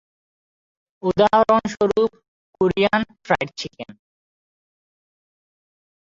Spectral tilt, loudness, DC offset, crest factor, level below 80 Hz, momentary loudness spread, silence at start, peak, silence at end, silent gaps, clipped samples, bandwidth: -5.5 dB/octave; -20 LUFS; under 0.1%; 20 dB; -54 dBFS; 16 LU; 1.05 s; -4 dBFS; 2.2 s; 2.28-2.53 s; under 0.1%; 7.6 kHz